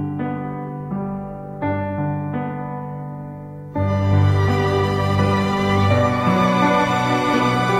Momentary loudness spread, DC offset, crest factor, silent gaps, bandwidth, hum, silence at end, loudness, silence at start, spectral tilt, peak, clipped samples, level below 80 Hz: 13 LU; under 0.1%; 14 dB; none; 12.5 kHz; none; 0 s; -20 LUFS; 0 s; -7 dB/octave; -4 dBFS; under 0.1%; -44 dBFS